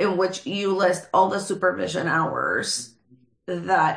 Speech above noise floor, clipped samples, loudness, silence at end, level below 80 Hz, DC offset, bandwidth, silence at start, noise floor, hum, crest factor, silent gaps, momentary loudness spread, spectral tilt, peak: 36 dB; under 0.1%; -23 LUFS; 0 s; -68 dBFS; under 0.1%; 10.5 kHz; 0 s; -59 dBFS; none; 16 dB; none; 10 LU; -4 dB/octave; -6 dBFS